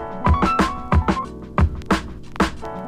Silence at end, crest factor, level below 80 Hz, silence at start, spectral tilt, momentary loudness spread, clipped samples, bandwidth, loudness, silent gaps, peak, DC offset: 0 s; 18 dB; -26 dBFS; 0 s; -6.5 dB/octave; 7 LU; under 0.1%; 11.5 kHz; -21 LUFS; none; -2 dBFS; under 0.1%